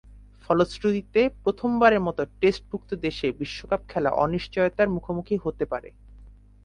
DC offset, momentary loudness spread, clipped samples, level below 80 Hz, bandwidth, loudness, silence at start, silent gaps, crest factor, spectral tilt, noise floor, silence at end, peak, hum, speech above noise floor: under 0.1%; 10 LU; under 0.1%; -48 dBFS; 10.5 kHz; -25 LUFS; 0.1 s; none; 22 dB; -7 dB/octave; -49 dBFS; 0.35 s; -4 dBFS; none; 24 dB